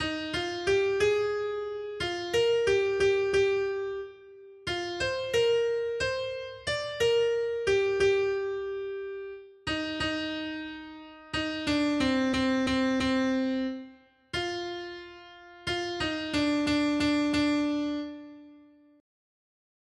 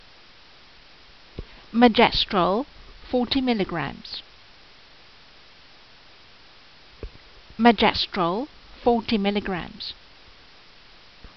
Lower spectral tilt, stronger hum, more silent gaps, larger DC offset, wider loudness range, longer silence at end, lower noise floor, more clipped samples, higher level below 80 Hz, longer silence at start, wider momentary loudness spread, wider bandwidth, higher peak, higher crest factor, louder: first, -4.5 dB/octave vs -3 dB/octave; neither; neither; second, under 0.1% vs 0.2%; second, 5 LU vs 8 LU; first, 1.4 s vs 0.1 s; first, -56 dBFS vs -51 dBFS; neither; second, -54 dBFS vs -48 dBFS; second, 0 s vs 1.35 s; second, 14 LU vs 25 LU; first, 12.5 kHz vs 6.2 kHz; second, -14 dBFS vs -4 dBFS; second, 14 dB vs 22 dB; second, -29 LUFS vs -22 LUFS